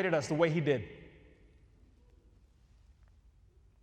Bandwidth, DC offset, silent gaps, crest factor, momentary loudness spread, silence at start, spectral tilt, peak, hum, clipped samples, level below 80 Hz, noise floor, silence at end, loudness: 10 kHz; under 0.1%; none; 20 dB; 20 LU; 0 s; -6.5 dB/octave; -16 dBFS; none; under 0.1%; -64 dBFS; -63 dBFS; 2.75 s; -31 LUFS